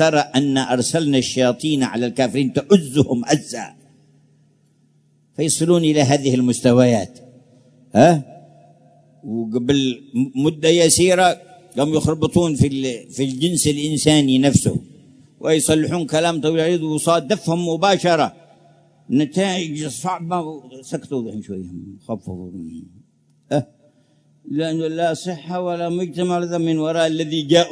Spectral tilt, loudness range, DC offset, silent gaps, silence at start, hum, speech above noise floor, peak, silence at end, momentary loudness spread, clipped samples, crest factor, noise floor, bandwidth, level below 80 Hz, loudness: -5 dB/octave; 10 LU; under 0.1%; none; 0 s; none; 40 dB; 0 dBFS; 0 s; 16 LU; under 0.1%; 18 dB; -58 dBFS; 11 kHz; -52 dBFS; -18 LUFS